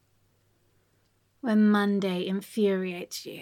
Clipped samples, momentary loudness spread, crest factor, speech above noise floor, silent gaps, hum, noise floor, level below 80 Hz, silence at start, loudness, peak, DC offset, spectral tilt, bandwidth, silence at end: under 0.1%; 14 LU; 14 dB; 43 dB; none; none; -69 dBFS; -78 dBFS; 1.45 s; -27 LUFS; -14 dBFS; under 0.1%; -6 dB/octave; 15.5 kHz; 0 s